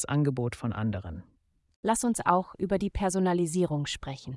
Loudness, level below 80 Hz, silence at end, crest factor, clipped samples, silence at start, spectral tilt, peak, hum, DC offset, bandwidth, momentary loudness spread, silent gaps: -29 LUFS; -50 dBFS; 0 s; 20 dB; under 0.1%; 0 s; -5.5 dB/octave; -8 dBFS; none; under 0.1%; 12 kHz; 9 LU; 1.76-1.83 s